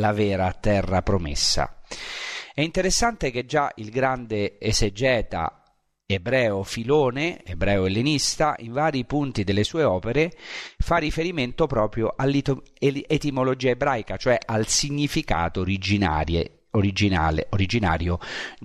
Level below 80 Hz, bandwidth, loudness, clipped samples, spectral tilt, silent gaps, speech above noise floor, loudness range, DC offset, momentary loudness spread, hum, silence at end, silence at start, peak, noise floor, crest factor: -36 dBFS; 13.5 kHz; -24 LUFS; under 0.1%; -4.5 dB/octave; none; 33 dB; 1 LU; under 0.1%; 7 LU; none; 0 s; 0 s; -6 dBFS; -56 dBFS; 16 dB